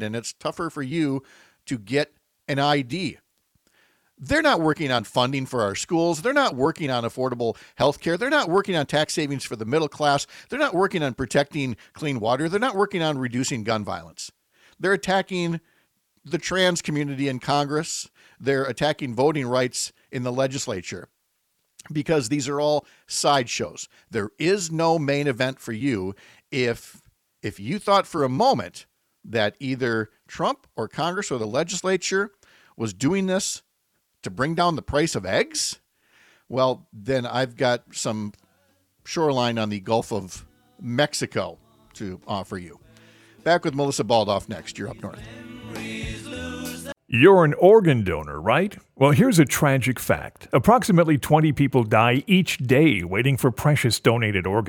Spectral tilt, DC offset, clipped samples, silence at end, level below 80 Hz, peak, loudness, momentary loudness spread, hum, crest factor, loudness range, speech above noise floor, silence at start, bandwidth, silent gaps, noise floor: -5 dB/octave; under 0.1%; under 0.1%; 0 s; -54 dBFS; -2 dBFS; -23 LUFS; 14 LU; none; 20 dB; 8 LU; 50 dB; 0 s; 19 kHz; none; -72 dBFS